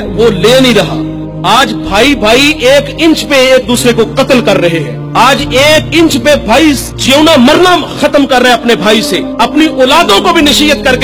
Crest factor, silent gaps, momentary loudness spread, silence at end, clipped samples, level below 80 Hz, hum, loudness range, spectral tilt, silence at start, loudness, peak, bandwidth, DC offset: 6 dB; none; 5 LU; 0 s; 5%; -28 dBFS; none; 1 LU; -4 dB/octave; 0 s; -6 LUFS; 0 dBFS; over 20 kHz; under 0.1%